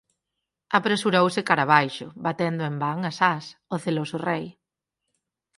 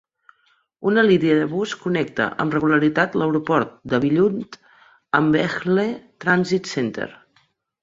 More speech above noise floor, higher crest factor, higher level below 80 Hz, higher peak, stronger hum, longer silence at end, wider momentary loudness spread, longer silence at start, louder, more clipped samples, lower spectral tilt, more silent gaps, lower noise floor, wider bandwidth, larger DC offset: first, 61 dB vs 44 dB; first, 24 dB vs 18 dB; second, -70 dBFS vs -60 dBFS; about the same, -2 dBFS vs -2 dBFS; neither; first, 1.05 s vs 0.7 s; about the same, 11 LU vs 9 LU; about the same, 0.7 s vs 0.8 s; second, -24 LUFS vs -20 LUFS; neither; about the same, -5.5 dB/octave vs -6.5 dB/octave; neither; first, -85 dBFS vs -64 dBFS; first, 11.5 kHz vs 7.8 kHz; neither